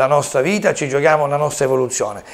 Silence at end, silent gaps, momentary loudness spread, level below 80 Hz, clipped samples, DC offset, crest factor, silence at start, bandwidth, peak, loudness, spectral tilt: 0 s; none; 4 LU; -56 dBFS; under 0.1%; under 0.1%; 16 dB; 0 s; 16 kHz; 0 dBFS; -17 LUFS; -4.5 dB/octave